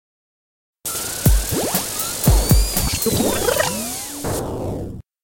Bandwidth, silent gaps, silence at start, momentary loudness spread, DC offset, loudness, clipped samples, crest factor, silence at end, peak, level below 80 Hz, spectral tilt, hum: 17 kHz; none; 0.85 s; 10 LU; under 0.1%; -19 LUFS; under 0.1%; 18 dB; 0.25 s; -2 dBFS; -24 dBFS; -4 dB/octave; none